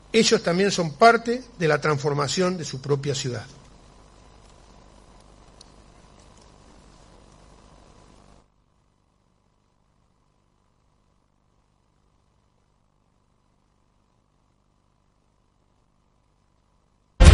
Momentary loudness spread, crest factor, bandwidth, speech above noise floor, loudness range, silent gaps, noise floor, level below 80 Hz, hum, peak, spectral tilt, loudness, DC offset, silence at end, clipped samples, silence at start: 13 LU; 26 dB; 11.5 kHz; 44 dB; 17 LU; none; -66 dBFS; -32 dBFS; 50 Hz at -60 dBFS; 0 dBFS; -5 dB/octave; -22 LUFS; under 0.1%; 0 s; under 0.1%; 0.15 s